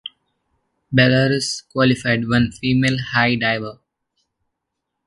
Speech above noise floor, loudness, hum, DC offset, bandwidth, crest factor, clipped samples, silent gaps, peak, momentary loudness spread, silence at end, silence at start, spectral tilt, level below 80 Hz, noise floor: 61 dB; -18 LUFS; none; under 0.1%; 11.5 kHz; 20 dB; under 0.1%; none; 0 dBFS; 8 LU; 1.35 s; 0.05 s; -5.5 dB/octave; -48 dBFS; -79 dBFS